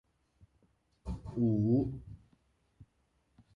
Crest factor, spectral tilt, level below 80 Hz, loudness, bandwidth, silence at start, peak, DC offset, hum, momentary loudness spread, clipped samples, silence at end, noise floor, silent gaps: 18 dB; -11.5 dB/octave; -54 dBFS; -33 LUFS; 5.6 kHz; 1.05 s; -20 dBFS; under 0.1%; none; 21 LU; under 0.1%; 0.7 s; -75 dBFS; none